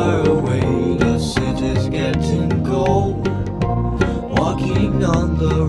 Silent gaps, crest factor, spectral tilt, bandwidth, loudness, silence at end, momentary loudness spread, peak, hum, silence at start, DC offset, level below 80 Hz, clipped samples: none; 16 dB; -7 dB/octave; 12 kHz; -18 LUFS; 0 s; 4 LU; -2 dBFS; none; 0 s; under 0.1%; -28 dBFS; under 0.1%